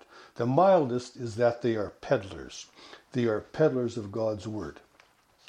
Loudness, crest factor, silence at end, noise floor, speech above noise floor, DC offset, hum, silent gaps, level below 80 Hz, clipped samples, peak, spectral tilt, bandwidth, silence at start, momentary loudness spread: -28 LUFS; 20 dB; 0.75 s; -62 dBFS; 34 dB; under 0.1%; none; none; -62 dBFS; under 0.1%; -10 dBFS; -7 dB/octave; 10 kHz; 0.15 s; 19 LU